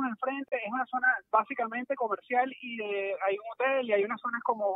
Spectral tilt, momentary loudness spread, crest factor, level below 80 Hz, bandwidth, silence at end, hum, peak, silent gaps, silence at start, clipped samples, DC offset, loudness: -7 dB/octave; 6 LU; 20 dB; -86 dBFS; 4 kHz; 0 s; none; -10 dBFS; none; 0 s; under 0.1%; under 0.1%; -30 LUFS